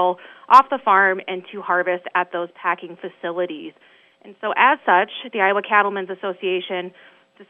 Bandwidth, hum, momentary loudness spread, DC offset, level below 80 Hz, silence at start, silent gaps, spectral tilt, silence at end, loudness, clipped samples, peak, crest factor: 7.8 kHz; none; 16 LU; under 0.1%; -78 dBFS; 0 s; none; -5 dB/octave; 0.05 s; -19 LUFS; under 0.1%; 0 dBFS; 20 dB